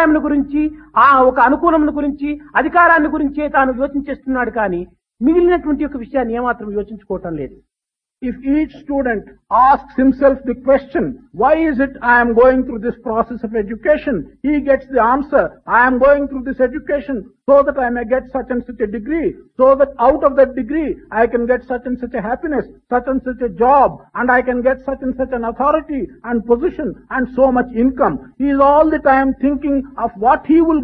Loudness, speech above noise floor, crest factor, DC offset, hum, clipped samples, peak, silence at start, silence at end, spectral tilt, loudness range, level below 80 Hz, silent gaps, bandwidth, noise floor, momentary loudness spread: -15 LUFS; 70 dB; 14 dB; under 0.1%; none; under 0.1%; 0 dBFS; 0 s; 0 s; -9.5 dB/octave; 4 LU; -40 dBFS; none; 5 kHz; -85 dBFS; 11 LU